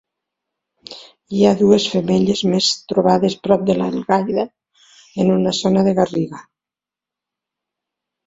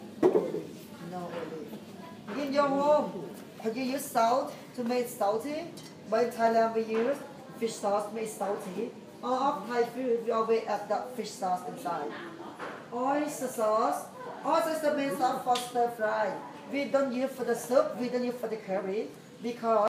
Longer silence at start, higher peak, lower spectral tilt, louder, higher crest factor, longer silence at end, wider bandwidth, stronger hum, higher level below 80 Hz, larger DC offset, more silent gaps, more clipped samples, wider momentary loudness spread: first, 0.9 s vs 0 s; first, 0 dBFS vs -12 dBFS; about the same, -5.5 dB/octave vs -4.5 dB/octave; first, -17 LUFS vs -31 LUFS; about the same, 18 dB vs 20 dB; first, 1.85 s vs 0 s; second, 7.8 kHz vs 15.5 kHz; neither; first, -56 dBFS vs -78 dBFS; neither; neither; neither; about the same, 14 LU vs 14 LU